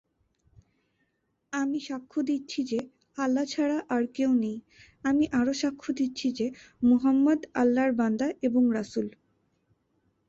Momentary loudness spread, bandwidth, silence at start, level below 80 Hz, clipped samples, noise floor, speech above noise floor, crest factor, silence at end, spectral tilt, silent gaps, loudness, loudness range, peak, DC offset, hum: 10 LU; 7.8 kHz; 1.5 s; -64 dBFS; under 0.1%; -76 dBFS; 49 dB; 14 dB; 1.2 s; -5 dB/octave; none; -27 LUFS; 5 LU; -14 dBFS; under 0.1%; none